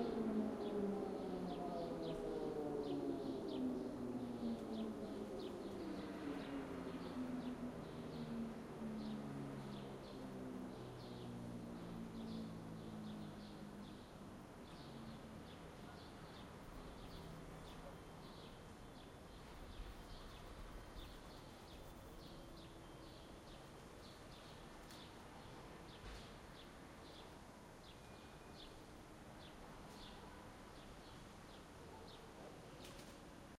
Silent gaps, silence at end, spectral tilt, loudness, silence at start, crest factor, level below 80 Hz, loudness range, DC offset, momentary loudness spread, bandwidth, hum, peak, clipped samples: none; 0 s; -6 dB/octave; -51 LUFS; 0 s; 20 dB; -64 dBFS; 12 LU; under 0.1%; 13 LU; 16 kHz; none; -30 dBFS; under 0.1%